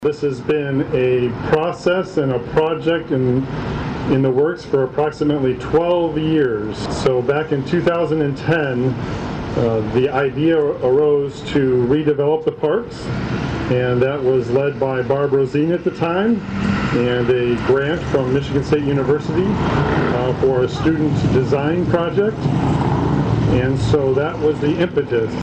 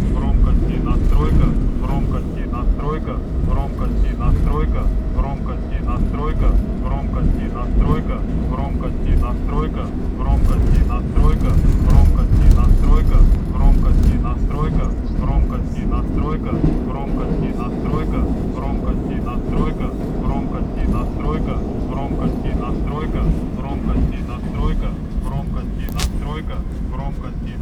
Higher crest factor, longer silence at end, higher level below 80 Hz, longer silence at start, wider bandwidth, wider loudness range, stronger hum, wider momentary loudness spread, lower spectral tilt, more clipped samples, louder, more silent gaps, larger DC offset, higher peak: about the same, 12 dB vs 16 dB; about the same, 0 s vs 0 s; second, -38 dBFS vs -18 dBFS; about the same, 0 s vs 0 s; about the same, 9 kHz vs 8.6 kHz; second, 1 LU vs 6 LU; neither; second, 4 LU vs 8 LU; about the same, -7.5 dB/octave vs -8.5 dB/octave; neither; about the same, -18 LUFS vs -20 LUFS; neither; neither; second, -6 dBFS vs 0 dBFS